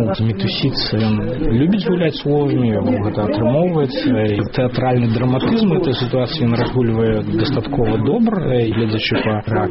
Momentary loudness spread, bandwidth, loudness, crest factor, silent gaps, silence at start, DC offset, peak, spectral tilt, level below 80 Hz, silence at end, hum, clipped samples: 3 LU; 5.8 kHz; -17 LUFS; 10 dB; none; 0 s; 0.2%; -6 dBFS; -6 dB/octave; -34 dBFS; 0 s; none; under 0.1%